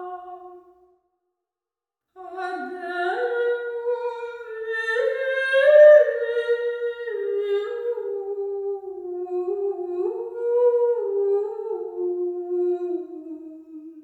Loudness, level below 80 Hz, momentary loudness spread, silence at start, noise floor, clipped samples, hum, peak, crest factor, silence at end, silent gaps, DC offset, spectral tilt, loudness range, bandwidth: -22 LUFS; -76 dBFS; 15 LU; 0 s; -90 dBFS; under 0.1%; none; -4 dBFS; 20 dB; 0 s; none; under 0.1%; -3.5 dB/octave; 10 LU; 9.6 kHz